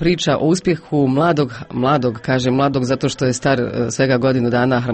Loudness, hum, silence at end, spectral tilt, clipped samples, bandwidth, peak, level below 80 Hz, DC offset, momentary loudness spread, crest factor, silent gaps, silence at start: -17 LUFS; none; 0 s; -6 dB/octave; under 0.1%; 8.8 kHz; -4 dBFS; -44 dBFS; under 0.1%; 4 LU; 12 dB; none; 0 s